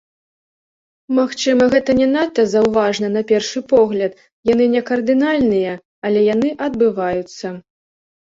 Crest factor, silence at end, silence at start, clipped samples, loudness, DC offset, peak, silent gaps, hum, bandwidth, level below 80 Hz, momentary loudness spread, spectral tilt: 14 dB; 0.8 s; 1.1 s; under 0.1%; -16 LUFS; under 0.1%; -2 dBFS; 4.32-4.43 s, 5.85-6.02 s; none; 7.8 kHz; -52 dBFS; 10 LU; -5 dB/octave